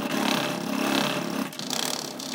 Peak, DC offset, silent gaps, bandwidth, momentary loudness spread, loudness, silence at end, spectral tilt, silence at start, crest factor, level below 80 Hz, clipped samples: -8 dBFS; under 0.1%; none; 19 kHz; 6 LU; -27 LUFS; 0 s; -3 dB/octave; 0 s; 20 dB; -72 dBFS; under 0.1%